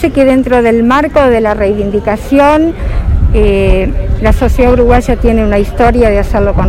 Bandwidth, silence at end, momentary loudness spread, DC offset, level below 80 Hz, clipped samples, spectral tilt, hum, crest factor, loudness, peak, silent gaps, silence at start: 14.5 kHz; 0 s; 5 LU; under 0.1%; -14 dBFS; 1%; -7.5 dB/octave; none; 8 dB; -9 LUFS; 0 dBFS; none; 0 s